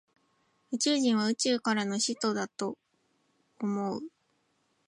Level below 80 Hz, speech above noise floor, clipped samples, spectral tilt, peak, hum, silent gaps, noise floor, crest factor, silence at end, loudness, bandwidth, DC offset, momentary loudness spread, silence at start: -80 dBFS; 44 dB; under 0.1%; -3.5 dB/octave; -16 dBFS; none; none; -74 dBFS; 16 dB; 0.8 s; -30 LUFS; 11 kHz; under 0.1%; 12 LU; 0.7 s